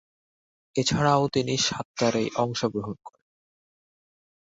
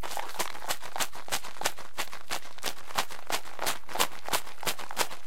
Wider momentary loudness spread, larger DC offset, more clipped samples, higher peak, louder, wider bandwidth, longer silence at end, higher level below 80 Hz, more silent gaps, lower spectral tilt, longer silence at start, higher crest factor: first, 11 LU vs 7 LU; second, under 0.1% vs 4%; neither; about the same, -6 dBFS vs -6 dBFS; first, -25 LUFS vs -33 LUFS; second, 8 kHz vs 17 kHz; first, 1.3 s vs 0 s; first, -56 dBFS vs -62 dBFS; first, 1.85-1.94 s vs none; first, -4.5 dB/octave vs -1 dB/octave; first, 0.75 s vs 0 s; second, 20 dB vs 30 dB